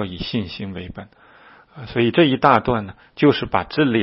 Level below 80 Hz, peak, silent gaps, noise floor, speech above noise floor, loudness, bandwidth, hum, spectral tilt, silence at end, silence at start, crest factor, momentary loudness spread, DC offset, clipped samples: -46 dBFS; 0 dBFS; none; -48 dBFS; 29 dB; -19 LUFS; 5.8 kHz; none; -9 dB/octave; 0 s; 0 s; 20 dB; 20 LU; under 0.1%; under 0.1%